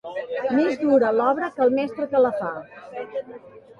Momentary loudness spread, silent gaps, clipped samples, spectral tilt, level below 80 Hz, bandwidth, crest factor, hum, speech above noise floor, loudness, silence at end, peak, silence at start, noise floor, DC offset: 16 LU; none; under 0.1%; -7 dB/octave; -68 dBFS; 7.2 kHz; 16 dB; none; 22 dB; -22 LUFS; 0.05 s; -6 dBFS; 0.05 s; -43 dBFS; under 0.1%